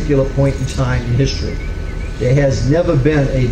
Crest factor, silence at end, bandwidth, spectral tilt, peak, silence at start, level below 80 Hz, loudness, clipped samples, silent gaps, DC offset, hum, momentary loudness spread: 14 dB; 0 s; 9.4 kHz; -7 dB/octave; 0 dBFS; 0 s; -22 dBFS; -16 LUFS; under 0.1%; none; under 0.1%; none; 11 LU